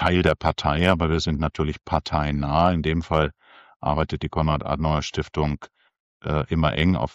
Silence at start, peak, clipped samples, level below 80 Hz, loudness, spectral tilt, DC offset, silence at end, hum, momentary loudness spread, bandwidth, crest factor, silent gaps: 0 s; -4 dBFS; under 0.1%; -34 dBFS; -23 LUFS; -6.5 dB/octave; under 0.1%; 0.05 s; none; 7 LU; 8.8 kHz; 18 dB; 3.76-3.80 s, 6.00-6.20 s